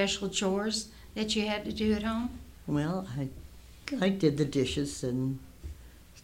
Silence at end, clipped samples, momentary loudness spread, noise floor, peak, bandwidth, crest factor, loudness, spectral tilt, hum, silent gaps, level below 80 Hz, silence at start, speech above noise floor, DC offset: 0.05 s; under 0.1%; 16 LU; -52 dBFS; -12 dBFS; 16 kHz; 20 dB; -31 LUFS; -5 dB/octave; none; none; -50 dBFS; 0 s; 21 dB; under 0.1%